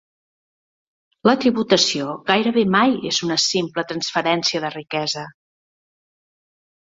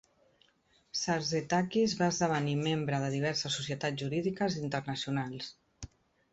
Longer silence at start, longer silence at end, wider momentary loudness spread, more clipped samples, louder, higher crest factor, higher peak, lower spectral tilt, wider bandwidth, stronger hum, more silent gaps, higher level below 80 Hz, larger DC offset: first, 1.25 s vs 0.95 s; first, 1.55 s vs 0.45 s; second, 9 LU vs 13 LU; neither; first, -19 LUFS vs -32 LUFS; about the same, 20 dB vs 18 dB; first, -2 dBFS vs -16 dBFS; about the same, -3.5 dB/octave vs -4.5 dB/octave; about the same, 8 kHz vs 8.2 kHz; neither; neither; about the same, -62 dBFS vs -64 dBFS; neither